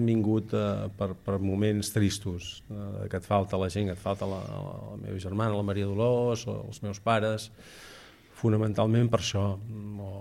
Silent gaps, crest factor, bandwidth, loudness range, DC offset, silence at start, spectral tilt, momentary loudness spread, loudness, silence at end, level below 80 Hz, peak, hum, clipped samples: none; 18 dB; 14 kHz; 3 LU; under 0.1%; 0 s; -6.5 dB/octave; 13 LU; -30 LUFS; 0 s; -56 dBFS; -10 dBFS; none; under 0.1%